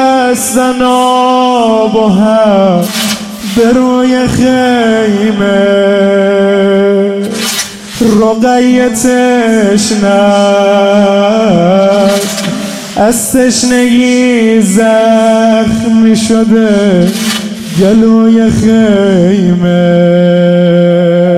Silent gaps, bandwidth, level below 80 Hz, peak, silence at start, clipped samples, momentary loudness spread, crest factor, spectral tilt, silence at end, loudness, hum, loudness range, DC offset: none; 16 kHz; -38 dBFS; 0 dBFS; 0 s; 1%; 5 LU; 8 dB; -5 dB/octave; 0 s; -8 LUFS; none; 2 LU; under 0.1%